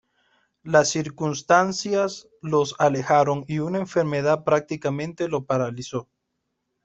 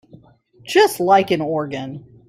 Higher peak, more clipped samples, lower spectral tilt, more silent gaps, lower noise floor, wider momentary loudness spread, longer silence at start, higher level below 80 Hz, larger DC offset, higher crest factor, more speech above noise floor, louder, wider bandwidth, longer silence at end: about the same, -4 dBFS vs -2 dBFS; neither; about the same, -5 dB/octave vs -4.5 dB/octave; neither; first, -78 dBFS vs -50 dBFS; second, 9 LU vs 14 LU; about the same, 0.65 s vs 0.65 s; about the same, -62 dBFS vs -62 dBFS; neither; about the same, 20 dB vs 18 dB; first, 55 dB vs 33 dB; second, -23 LUFS vs -17 LUFS; second, 8.4 kHz vs 16 kHz; first, 0.8 s vs 0.3 s